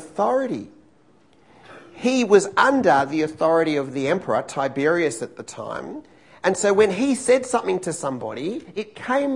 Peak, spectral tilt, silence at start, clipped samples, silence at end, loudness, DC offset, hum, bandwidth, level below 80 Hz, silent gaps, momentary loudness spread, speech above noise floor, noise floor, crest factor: -2 dBFS; -4.5 dB/octave; 0 s; under 0.1%; 0 s; -21 LUFS; 0.1%; none; 11 kHz; -64 dBFS; none; 15 LU; 36 dB; -57 dBFS; 20 dB